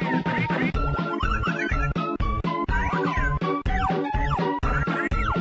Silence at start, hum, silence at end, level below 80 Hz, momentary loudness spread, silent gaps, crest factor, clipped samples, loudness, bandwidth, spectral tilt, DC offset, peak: 0 s; none; 0 s; -30 dBFS; 2 LU; none; 12 dB; under 0.1%; -25 LUFS; 7.8 kHz; -7 dB/octave; under 0.1%; -12 dBFS